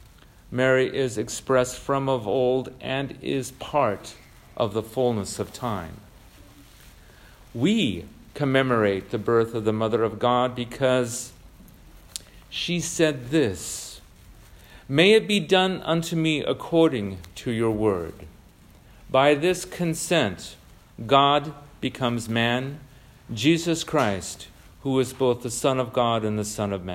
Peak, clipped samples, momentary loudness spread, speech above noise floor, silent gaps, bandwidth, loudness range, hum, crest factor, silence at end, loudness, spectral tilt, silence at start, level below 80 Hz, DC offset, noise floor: -4 dBFS; under 0.1%; 15 LU; 28 dB; none; 16 kHz; 5 LU; none; 22 dB; 0 s; -24 LUFS; -5 dB/octave; 0.5 s; -52 dBFS; under 0.1%; -51 dBFS